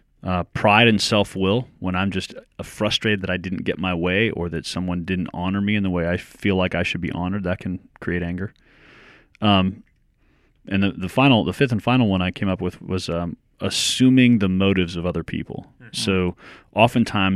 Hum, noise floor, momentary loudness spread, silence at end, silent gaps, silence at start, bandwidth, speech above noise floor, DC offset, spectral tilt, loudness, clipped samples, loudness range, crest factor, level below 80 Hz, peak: none; -60 dBFS; 12 LU; 0 s; none; 0.25 s; 14 kHz; 39 dB; under 0.1%; -5.5 dB/octave; -21 LUFS; under 0.1%; 5 LU; 22 dB; -48 dBFS; 0 dBFS